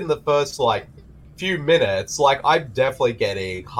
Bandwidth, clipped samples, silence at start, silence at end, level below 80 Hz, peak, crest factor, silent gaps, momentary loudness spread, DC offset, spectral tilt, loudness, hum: 15.5 kHz; under 0.1%; 0 s; 0 s; -50 dBFS; -4 dBFS; 18 dB; none; 7 LU; under 0.1%; -4 dB/octave; -20 LUFS; none